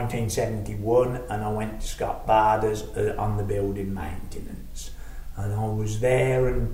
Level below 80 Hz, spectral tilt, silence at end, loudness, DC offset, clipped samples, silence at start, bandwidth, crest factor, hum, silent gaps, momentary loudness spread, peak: -36 dBFS; -6.5 dB/octave; 0 s; -26 LUFS; under 0.1%; under 0.1%; 0 s; 16 kHz; 16 dB; none; none; 18 LU; -8 dBFS